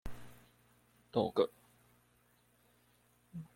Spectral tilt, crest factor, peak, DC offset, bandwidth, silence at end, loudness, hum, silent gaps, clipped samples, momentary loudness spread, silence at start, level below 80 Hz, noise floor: -7 dB/octave; 24 dB; -18 dBFS; under 0.1%; 16.5 kHz; 0.1 s; -36 LUFS; 60 Hz at -70 dBFS; none; under 0.1%; 23 LU; 0.05 s; -62 dBFS; -71 dBFS